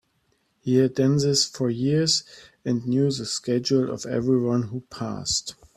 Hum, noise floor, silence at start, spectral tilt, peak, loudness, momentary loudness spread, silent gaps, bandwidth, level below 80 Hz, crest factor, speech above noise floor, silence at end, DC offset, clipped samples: none; -69 dBFS; 0.65 s; -5 dB/octave; -8 dBFS; -23 LUFS; 10 LU; none; 13 kHz; -58 dBFS; 16 dB; 45 dB; 0.25 s; under 0.1%; under 0.1%